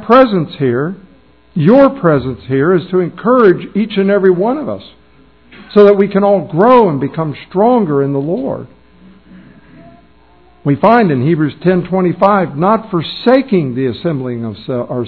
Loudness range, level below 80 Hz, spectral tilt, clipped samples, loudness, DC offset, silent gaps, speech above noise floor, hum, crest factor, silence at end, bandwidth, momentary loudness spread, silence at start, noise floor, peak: 5 LU; -48 dBFS; -10 dB/octave; 0.8%; -12 LUFS; 0.3%; none; 35 dB; none; 12 dB; 0 s; 5.4 kHz; 12 LU; 0 s; -46 dBFS; 0 dBFS